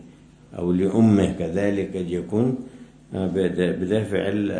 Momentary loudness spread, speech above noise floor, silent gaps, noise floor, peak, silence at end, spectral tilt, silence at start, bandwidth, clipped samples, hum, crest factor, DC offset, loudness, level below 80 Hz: 12 LU; 26 dB; none; -48 dBFS; -6 dBFS; 0 s; -8 dB/octave; 0 s; 10.5 kHz; under 0.1%; none; 18 dB; under 0.1%; -23 LUFS; -50 dBFS